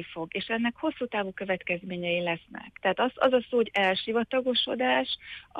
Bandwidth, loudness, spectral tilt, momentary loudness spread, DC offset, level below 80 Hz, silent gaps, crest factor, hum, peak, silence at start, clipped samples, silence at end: 8.4 kHz; -28 LUFS; -6 dB/octave; 8 LU; under 0.1%; -64 dBFS; none; 18 dB; none; -10 dBFS; 0 s; under 0.1%; 0 s